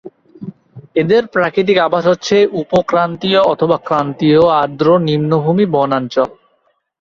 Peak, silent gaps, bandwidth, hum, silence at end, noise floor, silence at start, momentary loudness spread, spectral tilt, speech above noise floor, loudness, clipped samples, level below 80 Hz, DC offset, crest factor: 0 dBFS; none; 7.4 kHz; none; 0.7 s; -61 dBFS; 0.05 s; 6 LU; -6.5 dB/octave; 48 dB; -14 LUFS; under 0.1%; -52 dBFS; under 0.1%; 14 dB